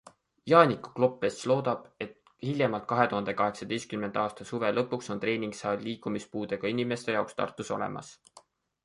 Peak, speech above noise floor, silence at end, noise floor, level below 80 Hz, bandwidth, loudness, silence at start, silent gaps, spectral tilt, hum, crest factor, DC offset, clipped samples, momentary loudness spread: -4 dBFS; 30 dB; 0.45 s; -59 dBFS; -68 dBFS; 11.5 kHz; -29 LUFS; 0.45 s; none; -5.5 dB/octave; none; 24 dB; under 0.1%; under 0.1%; 10 LU